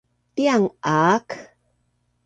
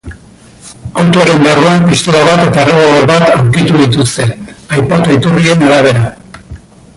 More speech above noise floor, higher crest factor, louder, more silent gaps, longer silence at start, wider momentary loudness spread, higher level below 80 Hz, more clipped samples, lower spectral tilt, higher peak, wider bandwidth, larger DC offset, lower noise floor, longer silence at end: first, 49 dB vs 29 dB; first, 18 dB vs 8 dB; second, -20 LUFS vs -8 LUFS; neither; first, 0.35 s vs 0.05 s; first, 17 LU vs 9 LU; second, -64 dBFS vs -36 dBFS; neither; about the same, -5.5 dB/octave vs -5.5 dB/octave; second, -4 dBFS vs 0 dBFS; second, 9.2 kHz vs 11.5 kHz; neither; first, -68 dBFS vs -36 dBFS; first, 0.8 s vs 0.4 s